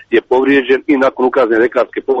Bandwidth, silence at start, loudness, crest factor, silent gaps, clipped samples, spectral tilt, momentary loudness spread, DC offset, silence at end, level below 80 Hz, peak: 7.4 kHz; 0.1 s; -12 LUFS; 12 dB; none; under 0.1%; -6 dB/octave; 3 LU; under 0.1%; 0 s; -52 dBFS; -2 dBFS